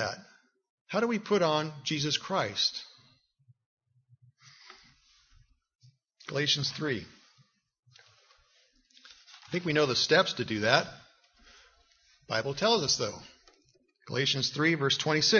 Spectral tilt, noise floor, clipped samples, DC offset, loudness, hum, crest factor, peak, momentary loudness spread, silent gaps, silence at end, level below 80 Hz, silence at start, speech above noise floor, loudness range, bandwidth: -3.5 dB/octave; -68 dBFS; under 0.1%; under 0.1%; -28 LUFS; none; 26 dB; -6 dBFS; 13 LU; 0.70-0.85 s, 3.66-3.77 s, 5.75-5.79 s; 0 s; -68 dBFS; 0 s; 40 dB; 7 LU; 7.2 kHz